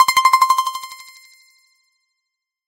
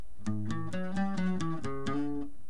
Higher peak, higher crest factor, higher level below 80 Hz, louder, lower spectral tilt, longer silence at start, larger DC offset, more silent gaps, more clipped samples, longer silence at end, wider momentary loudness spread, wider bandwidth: first, 0 dBFS vs -20 dBFS; about the same, 18 dB vs 14 dB; second, -62 dBFS vs -56 dBFS; first, -15 LUFS vs -35 LUFS; second, 3 dB/octave vs -7 dB/octave; about the same, 0 s vs 0 s; second, under 0.1% vs 2%; neither; neither; first, 1.7 s vs 0.05 s; first, 22 LU vs 5 LU; first, 17 kHz vs 10.5 kHz